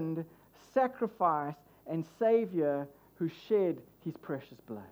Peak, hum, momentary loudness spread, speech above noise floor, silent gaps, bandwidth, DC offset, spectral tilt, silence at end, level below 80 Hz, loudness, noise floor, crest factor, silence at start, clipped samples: -16 dBFS; none; 16 LU; 27 dB; none; over 20 kHz; under 0.1%; -8.5 dB/octave; 0 s; -76 dBFS; -33 LUFS; -59 dBFS; 18 dB; 0 s; under 0.1%